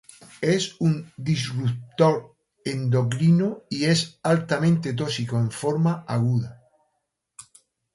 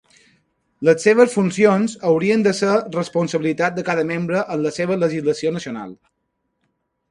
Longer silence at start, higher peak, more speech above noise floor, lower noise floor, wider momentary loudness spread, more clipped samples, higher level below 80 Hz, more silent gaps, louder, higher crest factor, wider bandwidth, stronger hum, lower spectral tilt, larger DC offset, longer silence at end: second, 0.4 s vs 0.8 s; second, -4 dBFS vs 0 dBFS; about the same, 54 dB vs 55 dB; first, -77 dBFS vs -73 dBFS; about the same, 7 LU vs 8 LU; neither; about the same, -60 dBFS vs -62 dBFS; neither; second, -24 LUFS vs -18 LUFS; about the same, 20 dB vs 18 dB; about the same, 11.5 kHz vs 11.5 kHz; neither; about the same, -6 dB/octave vs -6 dB/octave; neither; first, 1.4 s vs 1.15 s